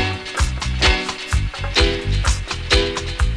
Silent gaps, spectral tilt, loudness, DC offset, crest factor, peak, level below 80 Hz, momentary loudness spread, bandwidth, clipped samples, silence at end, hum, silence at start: none; -3.5 dB/octave; -19 LUFS; under 0.1%; 18 dB; -2 dBFS; -22 dBFS; 6 LU; 11 kHz; under 0.1%; 0 s; none; 0 s